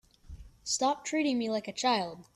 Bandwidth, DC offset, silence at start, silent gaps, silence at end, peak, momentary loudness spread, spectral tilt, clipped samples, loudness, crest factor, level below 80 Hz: 13.5 kHz; under 0.1%; 0.3 s; none; 0.15 s; -16 dBFS; 4 LU; -2.5 dB/octave; under 0.1%; -30 LUFS; 16 dB; -58 dBFS